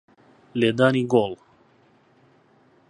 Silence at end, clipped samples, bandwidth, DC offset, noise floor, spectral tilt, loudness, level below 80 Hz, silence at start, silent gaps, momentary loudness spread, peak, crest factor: 1.55 s; under 0.1%; 10.5 kHz; under 0.1%; -58 dBFS; -7 dB/octave; -22 LUFS; -66 dBFS; 0.55 s; none; 14 LU; -4 dBFS; 22 dB